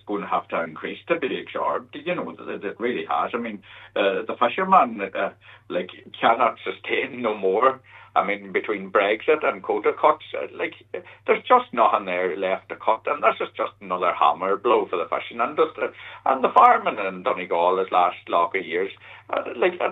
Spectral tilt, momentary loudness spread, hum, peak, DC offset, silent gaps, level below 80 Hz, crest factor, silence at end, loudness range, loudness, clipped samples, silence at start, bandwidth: -7 dB/octave; 12 LU; none; -2 dBFS; under 0.1%; none; -72 dBFS; 20 dB; 0 s; 5 LU; -23 LUFS; under 0.1%; 0.05 s; 7.2 kHz